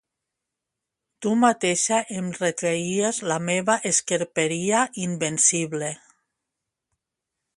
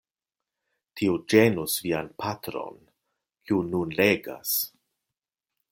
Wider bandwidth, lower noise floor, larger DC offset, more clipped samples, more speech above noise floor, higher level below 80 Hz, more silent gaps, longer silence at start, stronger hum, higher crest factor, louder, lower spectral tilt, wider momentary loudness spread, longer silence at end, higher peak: second, 11.5 kHz vs 17 kHz; second, -85 dBFS vs -89 dBFS; neither; neither; about the same, 62 dB vs 64 dB; about the same, -68 dBFS vs -64 dBFS; neither; first, 1.2 s vs 0.95 s; neither; about the same, 20 dB vs 22 dB; first, -23 LUFS vs -26 LUFS; second, -3 dB/octave vs -4.5 dB/octave; second, 9 LU vs 14 LU; first, 1.6 s vs 1.05 s; about the same, -4 dBFS vs -6 dBFS